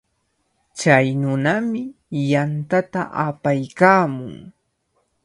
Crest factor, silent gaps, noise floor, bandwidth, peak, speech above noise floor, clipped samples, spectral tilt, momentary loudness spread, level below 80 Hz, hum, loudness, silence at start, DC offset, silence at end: 20 dB; none; -69 dBFS; 11.5 kHz; 0 dBFS; 50 dB; under 0.1%; -6.5 dB/octave; 14 LU; -60 dBFS; none; -19 LUFS; 0.75 s; under 0.1%; 0.75 s